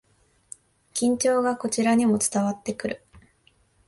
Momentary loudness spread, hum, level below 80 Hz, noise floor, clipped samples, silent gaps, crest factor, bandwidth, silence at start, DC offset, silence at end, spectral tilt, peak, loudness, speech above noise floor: 24 LU; none; -62 dBFS; -63 dBFS; under 0.1%; none; 16 dB; 12 kHz; 0.95 s; under 0.1%; 0.7 s; -4 dB/octave; -10 dBFS; -24 LUFS; 40 dB